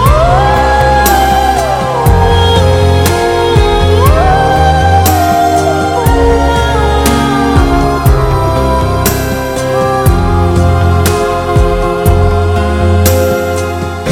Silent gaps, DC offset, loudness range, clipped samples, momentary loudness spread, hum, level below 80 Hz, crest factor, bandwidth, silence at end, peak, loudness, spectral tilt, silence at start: none; under 0.1%; 2 LU; 0.4%; 4 LU; none; -16 dBFS; 8 dB; 18 kHz; 0 s; 0 dBFS; -9 LUFS; -5.5 dB/octave; 0 s